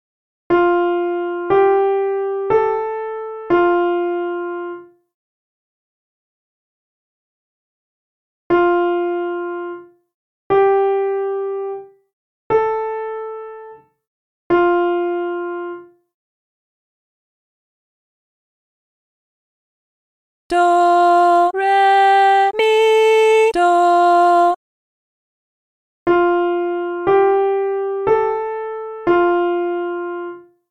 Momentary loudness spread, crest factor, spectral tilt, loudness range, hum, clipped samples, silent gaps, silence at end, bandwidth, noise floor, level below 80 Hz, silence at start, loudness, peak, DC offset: 15 LU; 14 dB; -5 dB/octave; 11 LU; none; under 0.1%; 5.14-8.50 s, 10.14-10.50 s, 12.13-12.50 s, 14.07-14.50 s, 16.14-20.50 s, 24.56-26.06 s; 0.3 s; 10 kHz; -40 dBFS; -56 dBFS; 0.5 s; -16 LUFS; -4 dBFS; under 0.1%